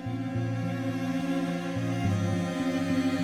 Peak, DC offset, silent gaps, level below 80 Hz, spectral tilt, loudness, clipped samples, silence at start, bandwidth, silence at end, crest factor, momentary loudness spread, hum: -16 dBFS; under 0.1%; none; -56 dBFS; -7 dB/octave; -30 LUFS; under 0.1%; 0 s; 13.5 kHz; 0 s; 12 dB; 3 LU; none